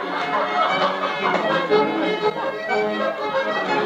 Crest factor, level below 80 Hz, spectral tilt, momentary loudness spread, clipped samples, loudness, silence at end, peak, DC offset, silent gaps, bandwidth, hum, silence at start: 16 dB; -64 dBFS; -5 dB/octave; 4 LU; under 0.1%; -21 LUFS; 0 s; -6 dBFS; under 0.1%; none; 9.2 kHz; none; 0 s